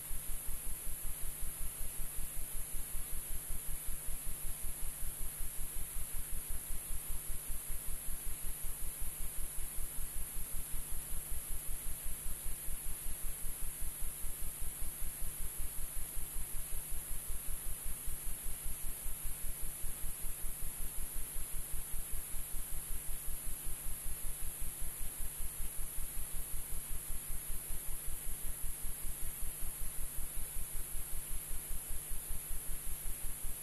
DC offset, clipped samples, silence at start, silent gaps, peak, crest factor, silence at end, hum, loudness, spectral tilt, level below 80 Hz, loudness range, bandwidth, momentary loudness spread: under 0.1%; under 0.1%; 0 s; none; -24 dBFS; 12 dB; 0 s; none; -42 LUFS; -2 dB/octave; -42 dBFS; 0 LU; 12.5 kHz; 0 LU